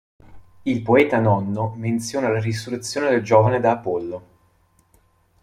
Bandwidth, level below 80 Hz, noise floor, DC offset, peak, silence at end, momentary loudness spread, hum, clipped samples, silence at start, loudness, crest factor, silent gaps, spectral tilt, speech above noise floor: 14.5 kHz; -58 dBFS; -60 dBFS; under 0.1%; -2 dBFS; 1.25 s; 11 LU; none; under 0.1%; 0.3 s; -20 LUFS; 20 dB; none; -6.5 dB/octave; 41 dB